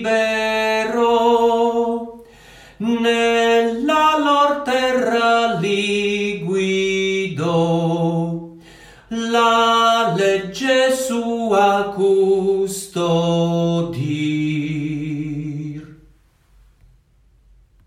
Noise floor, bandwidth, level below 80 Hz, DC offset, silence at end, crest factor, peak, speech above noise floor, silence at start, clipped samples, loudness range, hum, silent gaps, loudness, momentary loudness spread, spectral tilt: -55 dBFS; 16 kHz; -54 dBFS; under 0.1%; 1.95 s; 14 dB; -4 dBFS; 37 dB; 0 s; under 0.1%; 6 LU; none; none; -18 LUFS; 10 LU; -5 dB/octave